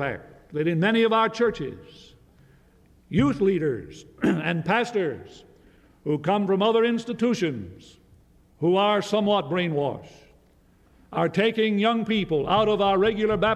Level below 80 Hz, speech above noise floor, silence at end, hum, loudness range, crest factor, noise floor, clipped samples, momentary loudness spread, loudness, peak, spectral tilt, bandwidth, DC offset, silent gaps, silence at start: -54 dBFS; 35 dB; 0 s; none; 2 LU; 16 dB; -58 dBFS; under 0.1%; 14 LU; -23 LUFS; -10 dBFS; -6.5 dB/octave; 12 kHz; under 0.1%; none; 0 s